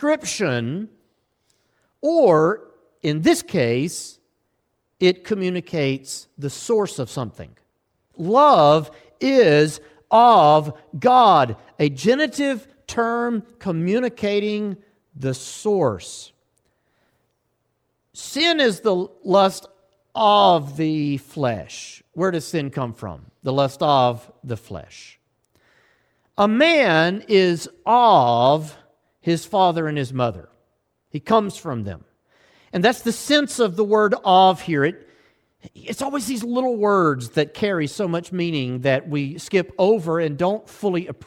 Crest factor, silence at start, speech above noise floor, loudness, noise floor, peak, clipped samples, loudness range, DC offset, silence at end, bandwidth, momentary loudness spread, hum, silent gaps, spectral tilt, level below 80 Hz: 16 dB; 0 s; 52 dB; -19 LUFS; -72 dBFS; -4 dBFS; under 0.1%; 8 LU; under 0.1%; 0.15 s; 17 kHz; 18 LU; none; none; -5 dB/octave; -60 dBFS